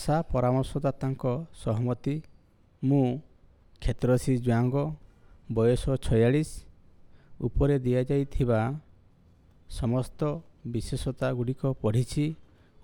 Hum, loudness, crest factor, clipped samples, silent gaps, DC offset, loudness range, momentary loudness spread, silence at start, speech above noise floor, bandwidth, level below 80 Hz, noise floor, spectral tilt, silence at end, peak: none; -28 LUFS; 16 dB; under 0.1%; none; under 0.1%; 4 LU; 10 LU; 0 s; 32 dB; 12.5 kHz; -42 dBFS; -59 dBFS; -7.5 dB/octave; 0.4 s; -12 dBFS